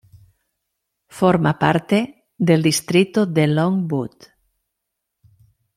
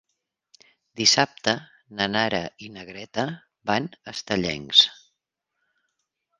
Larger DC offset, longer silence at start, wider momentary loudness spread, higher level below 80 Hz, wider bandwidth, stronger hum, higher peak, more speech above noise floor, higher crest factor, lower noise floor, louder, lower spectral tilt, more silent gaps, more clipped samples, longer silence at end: neither; first, 1.15 s vs 0.95 s; second, 8 LU vs 20 LU; about the same, -58 dBFS vs -60 dBFS; first, 15.5 kHz vs 11 kHz; neither; about the same, -2 dBFS vs 0 dBFS; first, 62 dB vs 57 dB; second, 18 dB vs 26 dB; about the same, -79 dBFS vs -81 dBFS; first, -18 LUFS vs -22 LUFS; first, -6 dB/octave vs -2.5 dB/octave; neither; neither; first, 1.7 s vs 1.45 s